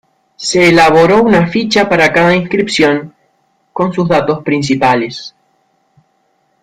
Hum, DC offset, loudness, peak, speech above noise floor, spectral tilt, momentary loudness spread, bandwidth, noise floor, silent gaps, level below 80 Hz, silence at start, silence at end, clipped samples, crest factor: none; under 0.1%; -10 LUFS; 0 dBFS; 49 dB; -5 dB/octave; 13 LU; 15 kHz; -59 dBFS; none; -46 dBFS; 0.4 s; 1.35 s; under 0.1%; 12 dB